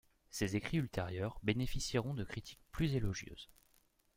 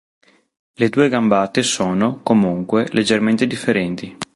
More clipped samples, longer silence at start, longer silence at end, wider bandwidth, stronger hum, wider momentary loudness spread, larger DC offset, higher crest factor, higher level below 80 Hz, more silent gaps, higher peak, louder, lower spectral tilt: neither; second, 0.35 s vs 0.8 s; first, 0.7 s vs 0.1 s; first, 16.5 kHz vs 11.5 kHz; neither; first, 13 LU vs 4 LU; neither; first, 22 dB vs 16 dB; about the same, -52 dBFS vs -54 dBFS; neither; second, -16 dBFS vs -2 dBFS; second, -39 LUFS vs -17 LUFS; about the same, -5.5 dB/octave vs -5 dB/octave